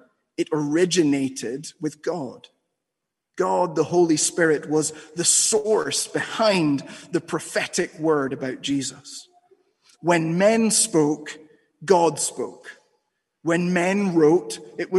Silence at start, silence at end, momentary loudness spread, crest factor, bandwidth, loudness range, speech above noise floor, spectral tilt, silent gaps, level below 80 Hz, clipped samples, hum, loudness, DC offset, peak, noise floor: 0.4 s; 0 s; 14 LU; 20 dB; 12.5 kHz; 5 LU; 61 dB; -3.5 dB/octave; none; -70 dBFS; under 0.1%; none; -22 LUFS; under 0.1%; -4 dBFS; -83 dBFS